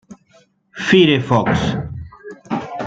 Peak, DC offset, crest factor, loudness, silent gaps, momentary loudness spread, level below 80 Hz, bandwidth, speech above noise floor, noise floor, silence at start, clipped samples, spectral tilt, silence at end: -2 dBFS; under 0.1%; 16 dB; -16 LUFS; none; 24 LU; -44 dBFS; 7.8 kHz; 40 dB; -54 dBFS; 0.1 s; under 0.1%; -6 dB/octave; 0 s